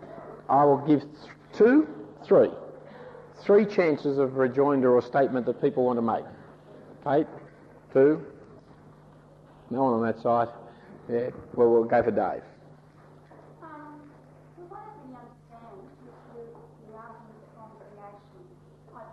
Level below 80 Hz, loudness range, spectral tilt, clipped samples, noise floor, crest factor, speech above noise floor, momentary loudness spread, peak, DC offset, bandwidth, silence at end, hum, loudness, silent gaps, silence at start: -66 dBFS; 23 LU; -9 dB/octave; under 0.1%; -53 dBFS; 16 dB; 30 dB; 25 LU; -10 dBFS; under 0.1%; 6.4 kHz; 0.05 s; 50 Hz at -60 dBFS; -24 LUFS; none; 0 s